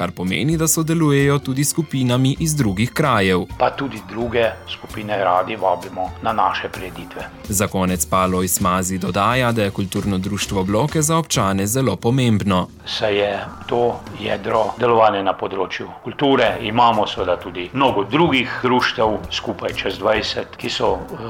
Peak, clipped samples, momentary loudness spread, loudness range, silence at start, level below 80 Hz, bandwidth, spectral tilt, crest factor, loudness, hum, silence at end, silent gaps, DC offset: -4 dBFS; under 0.1%; 9 LU; 3 LU; 0 s; -42 dBFS; 18 kHz; -4.5 dB/octave; 16 dB; -19 LUFS; none; 0 s; none; under 0.1%